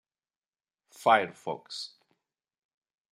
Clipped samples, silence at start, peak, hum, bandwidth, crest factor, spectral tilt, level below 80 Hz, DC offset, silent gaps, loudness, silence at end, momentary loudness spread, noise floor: under 0.1%; 1 s; -8 dBFS; none; 15 kHz; 24 dB; -3.5 dB/octave; -86 dBFS; under 0.1%; none; -28 LUFS; 1.25 s; 15 LU; under -90 dBFS